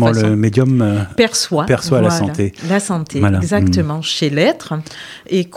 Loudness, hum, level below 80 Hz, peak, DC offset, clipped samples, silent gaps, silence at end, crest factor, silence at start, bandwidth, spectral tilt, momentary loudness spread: -15 LUFS; none; -44 dBFS; 0 dBFS; under 0.1%; under 0.1%; none; 0 s; 14 dB; 0 s; 15 kHz; -5.5 dB/octave; 7 LU